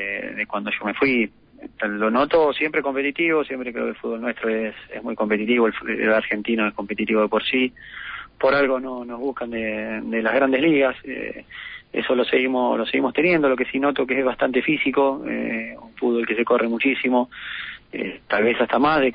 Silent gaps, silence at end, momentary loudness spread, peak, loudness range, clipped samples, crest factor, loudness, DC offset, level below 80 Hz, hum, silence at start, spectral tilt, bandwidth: none; 0 s; 12 LU; -6 dBFS; 2 LU; under 0.1%; 14 dB; -22 LUFS; under 0.1%; -56 dBFS; none; 0 s; -10 dB/octave; 5.2 kHz